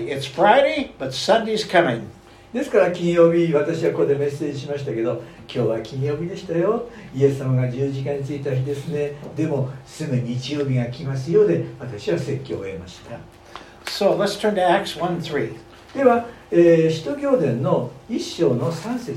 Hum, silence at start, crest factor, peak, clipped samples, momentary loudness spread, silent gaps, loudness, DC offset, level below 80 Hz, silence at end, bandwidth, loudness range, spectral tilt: none; 0 s; 20 dB; -2 dBFS; under 0.1%; 14 LU; none; -21 LUFS; under 0.1%; -54 dBFS; 0 s; 14.5 kHz; 5 LU; -6.5 dB/octave